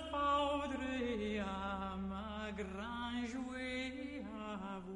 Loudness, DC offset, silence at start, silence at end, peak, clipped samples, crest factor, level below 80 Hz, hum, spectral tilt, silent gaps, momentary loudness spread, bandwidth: -41 LUFS; under 0.1%; 0 s; 0 s; -26 dBFS; under 0.1%; 16 dB; -56 dBFS; none; -5.5 dB/octave; none; 10 LU; 11 kHz